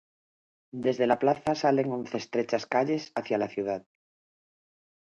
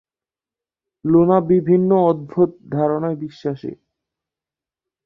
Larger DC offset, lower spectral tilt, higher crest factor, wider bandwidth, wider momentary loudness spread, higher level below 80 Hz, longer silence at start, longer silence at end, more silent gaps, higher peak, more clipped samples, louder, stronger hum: neither; second, -6 dB/octave vs -11 dB/octave; about the same, 20 dB vs 16 dB; first, 10.5 kHz vs 5.6 kHz; second, 8 LU vs 12 LU; second, -70 dBFS vs -58 dBFS; second, 0.75 s vs 1.05 s; about the same, 1.25 s vs 1.3 s; neither; second, -10 dBFS vs -2 dBFS; neither; second, -28 LUFS vs -18 LUFS; neither